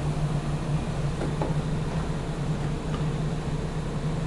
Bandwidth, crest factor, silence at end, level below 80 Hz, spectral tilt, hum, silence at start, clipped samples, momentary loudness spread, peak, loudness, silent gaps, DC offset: 11.5 kHz; 16 dB; 0 s; -36 dBFS; -7 dB/octave; none; 0 s; under 0.1%; 3 LU; -12 dBFS; -29 LUFS; none; under 0.1%